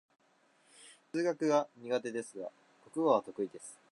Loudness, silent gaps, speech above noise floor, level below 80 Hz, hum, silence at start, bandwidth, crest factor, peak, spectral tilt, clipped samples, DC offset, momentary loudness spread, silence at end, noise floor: -34 LUFS; none; 36 dB; -88 dBFS; none; 0.8 s; 11.5 kHz; 22 dB; -14 dBFS; -5 dB/octave; under 0.1%; under 0.1%; 15 LU; 0.15 s; -69 dBFS